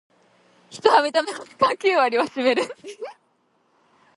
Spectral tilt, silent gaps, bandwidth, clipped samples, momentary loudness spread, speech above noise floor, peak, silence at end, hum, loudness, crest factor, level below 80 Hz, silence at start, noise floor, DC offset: -3 dB/octave; none; 11.5 kHz; under 0.1%; 19 LU; 44 dB; 0 dBFS; 1.05 s; none; -21 LUFS; 22 dB; -72 dBFS; 0.7 s; -66 dBFS; under 0.1%